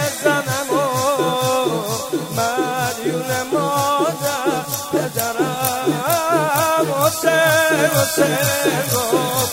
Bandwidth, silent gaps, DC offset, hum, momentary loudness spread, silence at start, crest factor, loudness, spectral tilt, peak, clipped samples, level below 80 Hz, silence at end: 16.5 kHz; none; under 0.1%; none; 6 LU; 0 s; 18 dB; -18 LUFS; -3.5 dB/octave; 0 dBFS; under 0.1%; -54 dBFS; 0 s